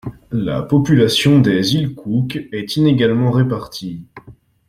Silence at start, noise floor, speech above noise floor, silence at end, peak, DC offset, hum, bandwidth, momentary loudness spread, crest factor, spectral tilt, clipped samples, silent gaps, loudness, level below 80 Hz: 0.05 s; -43 dBFS; 28 dB; 0.35 s; 0 dBFS; under 0.1%; none; 15.5 kHz; 13 LU; 16 dB; -6.5 dB/octave; under 0.1%; none; -16 LUFS; -46 dBFS